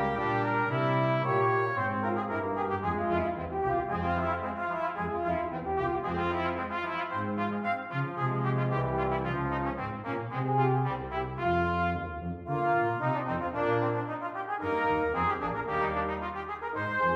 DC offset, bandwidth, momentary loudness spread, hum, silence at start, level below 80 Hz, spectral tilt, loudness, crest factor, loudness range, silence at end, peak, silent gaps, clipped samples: under 0.1%; 6.6 kHz; 6 LU; none; 0 s; -50 dBFS; -8.5 dB/octave; -30 LUFS; 16 dB; 2 LU; 0 s; -14 dBFS; none; under 0.1%